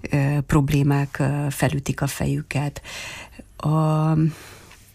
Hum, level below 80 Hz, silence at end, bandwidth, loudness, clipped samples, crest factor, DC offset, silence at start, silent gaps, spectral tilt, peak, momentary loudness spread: none; -42 dBFS; 0.2 s; 15.5 kHz; -22 LUFS; under 0.1%; 16 dB; under 0.1%; 0.05 s; none; -6.5 dB/octave; -6 dBFS; 14 LU